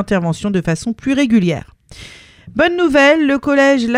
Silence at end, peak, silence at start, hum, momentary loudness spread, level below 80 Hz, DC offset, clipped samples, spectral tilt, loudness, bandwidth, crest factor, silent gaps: 0 s; 0 dBFS; 0 s; none; 9 LU; -42 dBFS; under 0.1%; under 0.1%; -5.5 dB/octave; -14 LUFS; 11.5 kHz; 14 dB; none